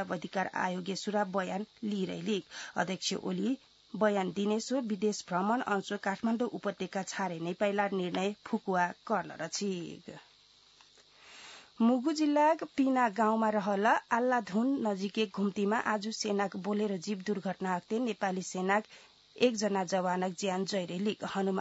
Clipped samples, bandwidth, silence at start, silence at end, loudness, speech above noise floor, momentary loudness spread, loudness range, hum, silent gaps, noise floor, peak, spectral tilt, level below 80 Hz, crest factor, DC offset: under 0.1%; 7.6 kHz; 0 s; 0 s; -32 LUFS; 31 dB; 8 LU; 6 LU; none; none; -62 dBFS; -14 dBFS; -4 dB/octave; -78 dBFS; 18 dB; under 0.1%